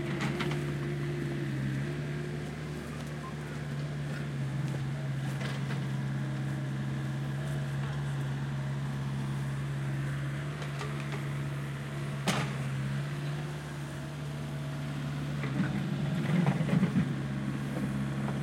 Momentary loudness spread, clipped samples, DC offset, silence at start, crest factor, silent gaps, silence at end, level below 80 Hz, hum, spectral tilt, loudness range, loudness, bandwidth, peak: 7 LU; under 0.1%; under 0.1%; 0 s; 18 dB; none; 0 s; -54 dBFS; none; -6.5 dB/octave; 4 LU; -34 LUFS; 13.5 kHz; -16 dBFS